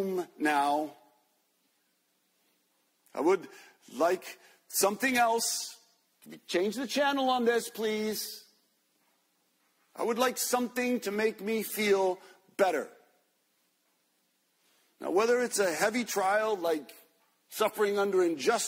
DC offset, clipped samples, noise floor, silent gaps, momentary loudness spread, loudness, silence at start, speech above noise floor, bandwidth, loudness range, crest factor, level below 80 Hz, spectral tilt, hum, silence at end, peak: under 0.1%; under 0.1%; -74 dBFS; none; 13 LU; -29 LUFS; 0 s; 45 dB; 16 kHz; 5 LU; 18 dB; -80 dBFS; -2.5 dB/octave; none; 0 s; -14 dBFS